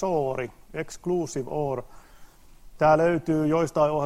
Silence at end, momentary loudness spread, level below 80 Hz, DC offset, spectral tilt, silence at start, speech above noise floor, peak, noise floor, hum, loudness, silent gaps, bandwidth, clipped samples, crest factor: 0 s; 14 LU; -52 dBFS; 0.1%; -6.5 dB/octave; 0 s; 24 dB; -8 dBFS; -49 dBFS; none; -25 LUFS; none; 15 kHz; under 0.1%; 18 dB